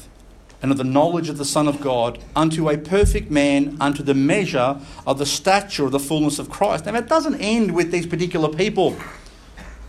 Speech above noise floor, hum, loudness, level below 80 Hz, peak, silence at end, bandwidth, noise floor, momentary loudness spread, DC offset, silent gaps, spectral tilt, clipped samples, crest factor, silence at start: 26 dB; none; -20 LUFS; -36 dBFS; -2 dBFS; 0 s; 14 kHz; -45 dBFS; 5 LU; under 0.1%; none; -5 dB/octave; under 0.1%; 18 dB; 0 s